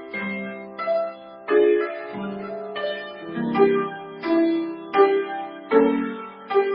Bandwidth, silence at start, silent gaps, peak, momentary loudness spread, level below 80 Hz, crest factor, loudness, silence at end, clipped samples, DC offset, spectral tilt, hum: 5.4 kHz; 0 s; none; -4 dBFS; 13 LU; -68 dBFS; 18 dB; -23 LUFS; 0 s; under 0.1%; under 0.1%; -10.5 dB/octave; none